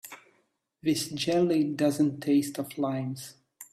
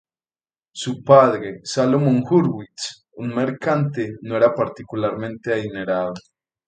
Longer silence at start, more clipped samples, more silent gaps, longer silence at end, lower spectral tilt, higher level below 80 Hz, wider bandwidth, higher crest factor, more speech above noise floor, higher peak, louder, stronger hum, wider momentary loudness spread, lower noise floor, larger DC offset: second, 0.05 s vs 0.75 s; neither; neither; second, 0.1 s vs 0.5 s; about the same, -5.5 dB/octave vs -6.5 dB/octave; second, -70 dBFS vs -60 dBFS; first, 15 kHz vs 9.4 kHz; second, 14 dB vs 20 dB; second, 45 dB vs over 71 dB; second, -14 dBFS vs 0 dBFS; second, -28 LUFS vs -20 LUFS; neither; second, 13 LU vs 16 LU; second, -72 dBFS vs under -90 dBFS; neither